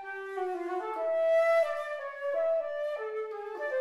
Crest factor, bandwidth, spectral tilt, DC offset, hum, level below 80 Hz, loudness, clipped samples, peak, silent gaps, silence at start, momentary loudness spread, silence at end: 12 dB; 12 kHz; -3 dB/octave; under 0.1%; none; -80 dBFS; -31 LUFS; under 0.1%; -18 dBFS; none; 0 s; 11 LU; 0 s